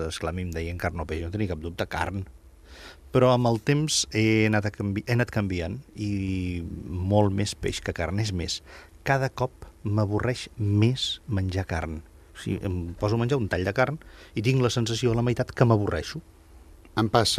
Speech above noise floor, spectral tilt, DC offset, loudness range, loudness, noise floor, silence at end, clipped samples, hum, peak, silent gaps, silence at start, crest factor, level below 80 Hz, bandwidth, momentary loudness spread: 24 dB; -5.5 dB/octave; under 0.1%; 4 LU; -26 LUFS; -50 dBFS; 0 s; under 0.1%; none; -4 dBFS; none; 0 s; 22 dB; -46 dBFS; 14.5 kHz; 12 LU